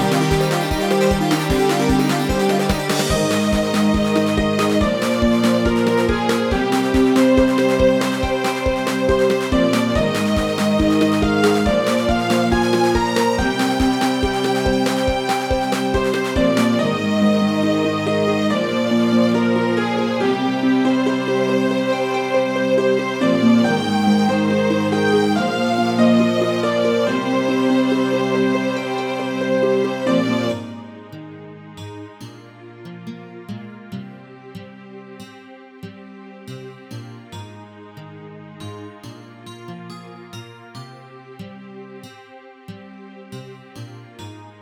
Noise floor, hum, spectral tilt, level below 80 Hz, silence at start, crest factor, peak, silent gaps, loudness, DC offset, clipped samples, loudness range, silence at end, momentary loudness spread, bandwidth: -43 dBFS; none; -5.5 dB/octave; -36 dBFS; 0 s; 16 dB; -4 dBFS; none; -18 LUFS; under 0.1%; under 0.1%; 20 LU; 0.1 s; 22 LU; 17.5 kHz